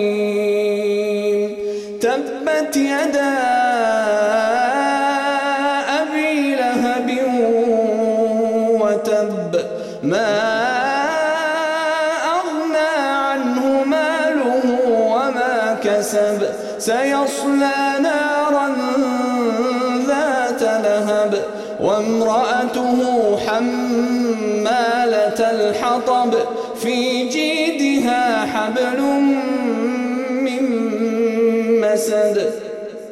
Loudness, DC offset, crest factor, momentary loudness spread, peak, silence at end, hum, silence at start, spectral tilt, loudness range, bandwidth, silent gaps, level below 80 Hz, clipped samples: -18 LUFS; under 0.1%; 12 dB; 4 LU; -6 dBFS; 0 s; none; 0 s; -4 dB/octave; 1 LU; 14.5 kHz; none; -62 dBFS; under 0.1%